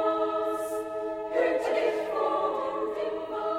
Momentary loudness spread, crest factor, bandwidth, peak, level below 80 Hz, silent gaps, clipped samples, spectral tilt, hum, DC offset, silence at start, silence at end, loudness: 6 LU; 16 dB; 16.5 kHz; -14 dBFS; -64 dBFS; none; under 0.1%; -4 dB/octave; none; under 0.1%; 0 s; 0 s; -29 LUFS